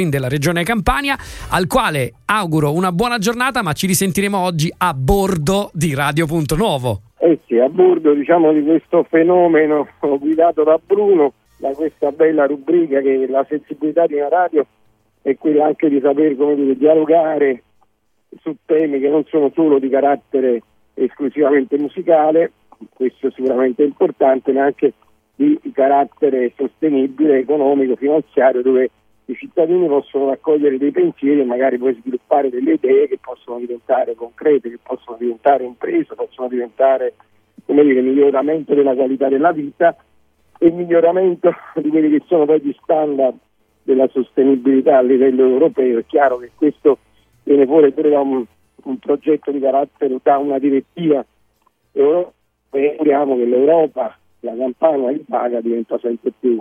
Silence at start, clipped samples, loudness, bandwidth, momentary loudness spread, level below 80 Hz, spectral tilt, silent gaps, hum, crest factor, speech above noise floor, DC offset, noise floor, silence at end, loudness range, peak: 0 s; under 0.1%; -16 LUFS; 15 kHz; 10 LU; -42 dBFS; -6 dB/octave; none; none; 16 dB; 46 dB; under 0.1%; -61 dBFS; 0 s; 3 LU; 0 dBFS